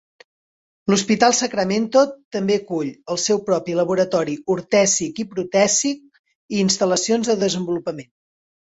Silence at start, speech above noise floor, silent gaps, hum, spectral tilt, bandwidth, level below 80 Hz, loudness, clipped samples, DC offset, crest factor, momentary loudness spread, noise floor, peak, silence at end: 0.85 s; over 71 dB; 2.25-2.31 s, 6.19-6.24 s, 6.35-6.49 s; none; -3.5 dB/octave; 8.2 kHz; -60 dBFS; -19 LUFS; under 0.1%; under 0.1%; 18 dB; 10 LU; under -90 dBFS; -2 dBFS; 0.6 s